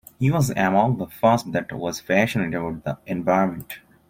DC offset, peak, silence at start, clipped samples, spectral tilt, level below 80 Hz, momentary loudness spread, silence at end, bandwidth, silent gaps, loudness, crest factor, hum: under 0.1%; -4 dBFS; 0.2 s; under 0.1%; -6.5 dB/octave; -52 dBFS; 10 LU; 0.3 s; 16.5 kHz; none; -22 LUFS; 20 dB; none